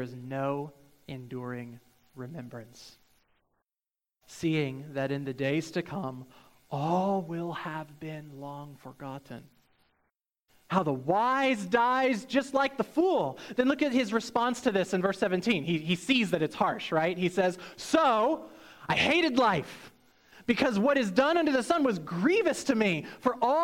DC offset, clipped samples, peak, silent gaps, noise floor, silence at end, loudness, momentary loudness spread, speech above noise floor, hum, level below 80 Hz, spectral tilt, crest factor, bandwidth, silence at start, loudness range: under 0.1%; under 0.1%; -10 dBFS; none; under -90 dBFS; 0 s; -28 LUFS; 18 LU; over 61 dB; none; -66 dBFS; -5.5 dB/octave; 18 dB; 16.5 kHz; 0 s; 12 LU